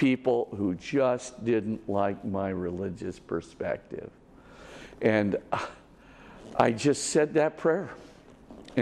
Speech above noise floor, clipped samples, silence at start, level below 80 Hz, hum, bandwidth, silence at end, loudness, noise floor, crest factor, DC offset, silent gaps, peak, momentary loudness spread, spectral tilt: 24 dB; under 0.1%; 0 s; -60 dBFS; none; 12.5 kHz; 0 s; -28 LUFS; -52 dBFS; 22 dB; under 0.1%; none; -8 dBFS; 17 LU; -5.5 dB/octave